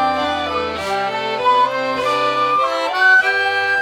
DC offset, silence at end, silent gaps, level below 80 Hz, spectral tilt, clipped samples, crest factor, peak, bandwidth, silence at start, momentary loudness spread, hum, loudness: under 0.1%; 0 s; none; -50 dBFS; -3 dB/octave; under 0.1%; 14 dB; -4 dBFS; 15.5 kHz; 0 s; 9 LU; none; -16 LUFS